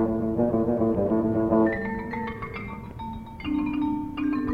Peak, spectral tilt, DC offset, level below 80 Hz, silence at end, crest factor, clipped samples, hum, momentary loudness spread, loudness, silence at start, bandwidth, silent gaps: -10 dBFS; -9.5 dB/octave; under 0.1%; -44 dBFS; 0 s; 16 dB; under 0.1%; none; 14 LU; -26 LUFS; 0 s; 5.2 kHz; none